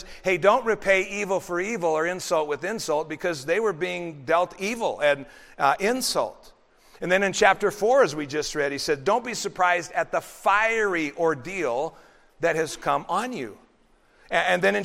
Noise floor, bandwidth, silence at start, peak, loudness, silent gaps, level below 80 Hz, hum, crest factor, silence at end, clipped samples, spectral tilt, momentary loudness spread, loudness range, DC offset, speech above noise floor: -60 dBFS; 16 kHz; 0 s; -4 dBFS; -24 LUFS; none; -56 dBFS; none; 22 dB; 0 s; under 0.1%; -3.5 dB/octave; 9 LU; 3 LU; under 0.1%; 36 dB